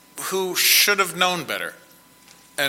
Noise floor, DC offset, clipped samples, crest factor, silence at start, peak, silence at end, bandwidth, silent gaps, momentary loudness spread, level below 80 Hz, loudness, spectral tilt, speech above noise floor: -51 dBFS; under 0.1%; under 0.1%; 20 dB; 0.15 s; -2 dBFS; 0 s; 16.5 kHz; none; 15 LU; -70 dBFS; -19 LUFS; -0.5 dB/octave; 30 dB